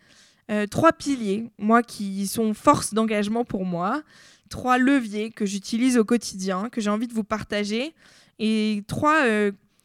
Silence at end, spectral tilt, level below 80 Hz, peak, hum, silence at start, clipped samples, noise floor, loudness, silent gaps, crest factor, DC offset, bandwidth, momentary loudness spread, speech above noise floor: 0.3 s; -5 dB/octave; -56 dBFS; -2 dBFS; none; 0.5 s; under 0.1%; -47 dBFS; -23 LUFS; none; 22 dB; under 0.1%; 15.5 kHz; 9 LU; 24 dB